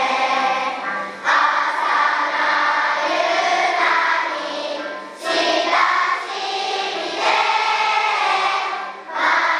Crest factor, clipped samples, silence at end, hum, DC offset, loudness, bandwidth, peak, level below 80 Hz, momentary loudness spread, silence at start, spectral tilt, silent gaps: 16 dB; under 0.1%; 0 s; none; under 0.1%; -18 LUFS; 12.5 kHz; -4 dBFS; -80 dBFS; 9 LU; 0 s; -0.5 dB/octave; none